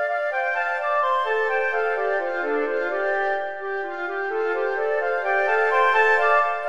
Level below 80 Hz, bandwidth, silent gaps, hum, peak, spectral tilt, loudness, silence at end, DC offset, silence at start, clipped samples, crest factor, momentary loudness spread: -72 dBFS; 8.8 kHz; none; none; -8 dBFS; -3 dB/octave; -22 LUFS; 0 s; 0.8%; 0 s; under 0.1%; 16 dB; 9 LU